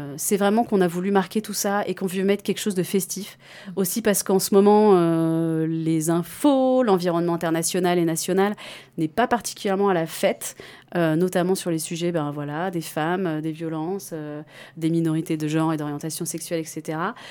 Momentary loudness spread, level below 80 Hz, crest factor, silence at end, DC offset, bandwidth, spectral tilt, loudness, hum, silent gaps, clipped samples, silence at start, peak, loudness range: 11 LU; -66 dBFS; 16 dB; 0 s; under 0.1%; 19 kHz; -5 dB/octave; -23 LUFS; none; none; under 0.1%; 0 s; -6 dBFS; 7 LU